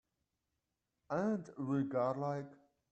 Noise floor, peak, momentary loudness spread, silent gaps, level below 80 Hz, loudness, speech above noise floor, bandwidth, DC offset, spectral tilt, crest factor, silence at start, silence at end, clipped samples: -87 dBFS; -24 dBFS; 7 LU; none; -80 dBFS; -38 LUFS; 50 dB; 8.4 kHz; under 0.1%; -8.5 dB/octave; 16 dB; 1.1 s; 0.35 s; under 0.1%